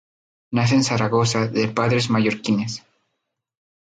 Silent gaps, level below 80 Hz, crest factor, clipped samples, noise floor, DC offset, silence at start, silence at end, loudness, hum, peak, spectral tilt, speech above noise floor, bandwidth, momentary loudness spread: none; -56 dBFS; 16 dB; under 0.1%; -78 dBFS; under 0.1%; 0.5 s; 1.1 s; -20 LUFS; none; -6 dBFS; -5.5 dB/octave; 58 dB; 9.4 kHz; 7 LU